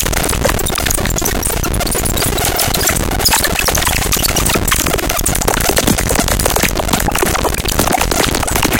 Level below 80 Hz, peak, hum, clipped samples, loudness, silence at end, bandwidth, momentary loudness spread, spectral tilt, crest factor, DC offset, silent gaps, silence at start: -22 dBFS; 0 dBFS; none; under 0.1%; -13 LUFS; 0 s; 18 kHz; 3 LU; -3 dB/octave; 14 dB; under 0.1%; none; 0 s